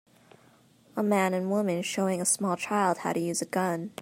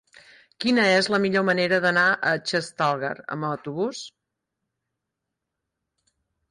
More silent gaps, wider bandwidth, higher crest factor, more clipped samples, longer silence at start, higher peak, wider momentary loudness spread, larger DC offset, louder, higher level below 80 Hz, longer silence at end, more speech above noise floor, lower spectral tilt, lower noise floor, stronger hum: neither; first, 16 kHz vs 11.5 kHz; about the same, 18 dB vs 16 dB; neither; first, 0.95 s vs 0.6 s; about the same, -12 dBFS vs -10 dBFS; second, 4 LU vs 11 LU; neither; second, -28 LUFS vs -23 LUFS; second, -76 dBFS vs -70 dBFS; second, 0 s vs 2.4 s; second, 32 dB vs 60 dB; about the same, -4.5 dB/octave vs -4.5 dB/octave; second, -60 dBFS vs -83 dBFS; neither